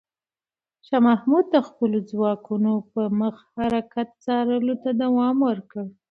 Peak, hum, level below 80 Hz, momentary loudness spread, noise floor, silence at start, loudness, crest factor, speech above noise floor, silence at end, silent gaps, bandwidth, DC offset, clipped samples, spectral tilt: -6 dBFS; none; -62 dBFS; 9 LU; under -90 dBFS; 0.9 s; -23 LUFS; 16 dB; over 68 dB; 0.2 s; none; 5.2 kHz; under 0.1%; under 0.1%; -8.5 dB/octave